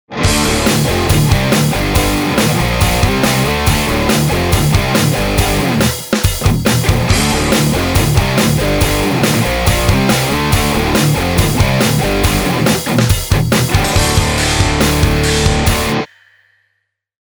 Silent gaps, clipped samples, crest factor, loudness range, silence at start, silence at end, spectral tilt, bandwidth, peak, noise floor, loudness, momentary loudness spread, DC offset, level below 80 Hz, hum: none; under 0.1%; 12 dB; 1 LU; 0.1 s; 1.25 s; -4.5 dB/octave; over 20 kHz; 0 dBFS; -68 dBFS; -13 LUFS; 2 LU; under 0.1%; -22 dBFS; none